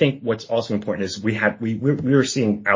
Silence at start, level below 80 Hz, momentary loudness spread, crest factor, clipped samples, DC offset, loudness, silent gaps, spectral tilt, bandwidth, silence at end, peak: 0 s; -54 dBFS; 6 LU; 18 dB; under 0.1%; under 0.1%; -21 LUFS; none; -5.5 dB/octave; 7.6 kHz; 0 s; -2 dBFS